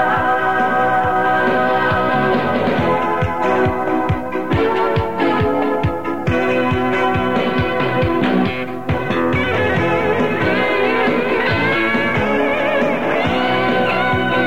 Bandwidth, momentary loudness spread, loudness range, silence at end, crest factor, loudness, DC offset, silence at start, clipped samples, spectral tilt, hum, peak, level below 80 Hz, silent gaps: 16.5 kHz; 3 LU; 2 LU; 0 s; 12 dB; -17 LUFS; 2%; 0 s; under 0.1%; -7 dB/octave; none; -4 dBFS; -38 dBFS; none